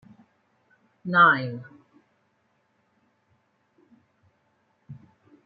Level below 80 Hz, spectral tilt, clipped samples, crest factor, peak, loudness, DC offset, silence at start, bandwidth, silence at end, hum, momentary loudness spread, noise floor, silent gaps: -78 dBFS; -3 dB/octave; under 0.1%; 24 dB; -6 dBFS; -20 LUFS; under 0.1%; 1.05 s; 5 kHz; 0.5 s; none; 31 LU; -70 dBFS; none